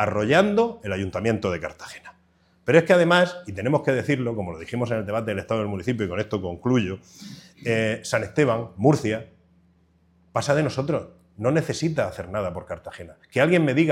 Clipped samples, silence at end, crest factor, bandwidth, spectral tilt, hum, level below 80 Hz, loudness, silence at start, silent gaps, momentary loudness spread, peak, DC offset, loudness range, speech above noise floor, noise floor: under 0.1%; 0 s; 22 dB; 15 kHz; -6 dB/octave; none; -56 dBFS; -23 LUFS; 0 s; none; 15 LU; -2 dBFS; under 0.1%; 4 LU; 38 dB; -61 dBFS